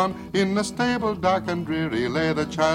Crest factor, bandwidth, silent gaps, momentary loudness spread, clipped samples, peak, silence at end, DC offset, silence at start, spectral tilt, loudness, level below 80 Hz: 18 dB; 15.5 kHz; none; 3 LU; under 0.1%; -6 dBFS; 0 s; under 0.1%; 0 s; -5.5 dB/octave; -24 LUFS; -52 dBFS